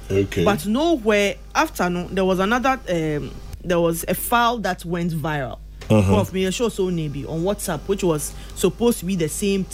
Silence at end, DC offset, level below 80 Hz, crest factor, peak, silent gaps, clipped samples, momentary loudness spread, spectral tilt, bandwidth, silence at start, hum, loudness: 0 s; under 0.1%; -38 dBFS; 18 dB; -4 dBFS; none; under 0.1%; 7 LU; -5 dB/octave; 16 kHz; 0 s; none; -21 LUFS